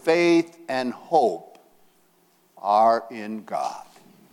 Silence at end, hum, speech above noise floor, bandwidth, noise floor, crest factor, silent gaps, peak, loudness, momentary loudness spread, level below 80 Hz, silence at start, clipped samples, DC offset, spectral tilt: 0.5 s; none; 39 dB; 13.5 kHz; -62 dBFS; 18 dB; none; -6 dBFS; -23 LUFS; 15 LU; -76 dBFS; 0.05 s; under 0.1%; under 0.1%; -5 dB/octave